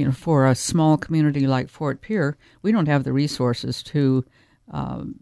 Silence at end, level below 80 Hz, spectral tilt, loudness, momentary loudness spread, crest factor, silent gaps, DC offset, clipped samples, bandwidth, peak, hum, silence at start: 0.1 s; -50 dBFS; -6.5 dB/octave; -22 LUFS; 11 LU; 16 dB; none; under 0.1%; under 0.1%; 11 kHz; -4 dBFS; none; 0 s